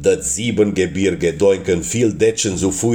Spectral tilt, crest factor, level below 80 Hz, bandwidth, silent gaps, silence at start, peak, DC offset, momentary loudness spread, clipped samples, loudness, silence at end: -4.5 dB/octave; 14 dB; -42 dBFS; 19 kHz; none; 0 s; -2 dBFS; under 0.1%; 3 LU; under 0.1%; -17 LUFS; 0 s